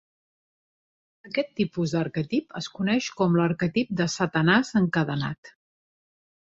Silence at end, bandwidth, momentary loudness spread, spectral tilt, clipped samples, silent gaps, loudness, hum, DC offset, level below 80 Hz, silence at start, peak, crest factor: 1.1 s; 7.8 kHz; 9 LU; -6 dB/octave; under 0.1%; 5.38-5.43 s; -25 LUFS; none; under 0.1%; -60 dBFS; 1.25 s; -6 dBFS; 20 dB